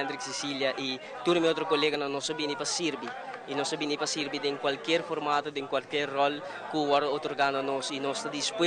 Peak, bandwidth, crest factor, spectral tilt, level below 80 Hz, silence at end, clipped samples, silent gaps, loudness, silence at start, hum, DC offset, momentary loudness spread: -14 dBFS; 10.5 kHz; 16 dB; -3 dB/octave; -74 dBFS; 0 s; under 0.1%; none; -30 LUFS; 0 s; none; under 0.1%; 7 LU